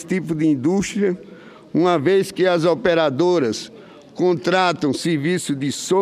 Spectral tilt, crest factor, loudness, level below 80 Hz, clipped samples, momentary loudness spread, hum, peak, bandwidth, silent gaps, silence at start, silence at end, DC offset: -5.5 dB/octave; 16 dB; -19 LUFS; -56 dBFS; under 0.1%; 6 LU; none; -4 dBFS; 14 kHz; none; 0 s; 0 s; under 0.1%